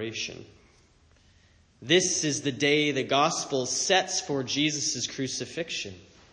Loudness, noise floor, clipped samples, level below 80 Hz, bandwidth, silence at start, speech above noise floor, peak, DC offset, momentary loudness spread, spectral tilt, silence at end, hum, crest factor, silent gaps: -26 LUFS; -60 dBFS; under 0.1%; -66 dBFS; 10 kHz; 0 s; 33 dB; -8 dBFS; under 0.1%; 11 LU; -2.5 dB/octave; 0.3 s; none; 20 dB; none